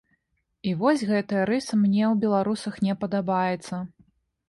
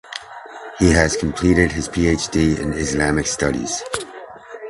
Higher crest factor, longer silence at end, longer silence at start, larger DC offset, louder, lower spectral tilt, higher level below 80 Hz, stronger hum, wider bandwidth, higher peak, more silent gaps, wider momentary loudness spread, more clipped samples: about the same, 16 dB vs 20 dB; first, 0.6 s vs 0 s; first, 0.65 s vs 0.05 s; neither; second, -25 LUFS vs -19 LUFS; first, -6.5 dB/octave vs -4.5 dB/octave; second, -64 dBFS vs -32 dBFS; neither; about the same, 11.5 kHz vs 11.5 kHz; second, -10 dBFS vs 0 dBFS; neither; second, 10 LU vs 19 LU; neither